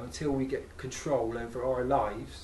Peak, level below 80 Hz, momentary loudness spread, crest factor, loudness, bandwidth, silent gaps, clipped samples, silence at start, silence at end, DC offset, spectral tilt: -14 dBFS; -48 dBFS; 9 LU; 18 dB; -32 LUFS; 12.5 kHz; none; under 0.1%; 0 s; 0 s; under 0.1%; -5.5 dB/octave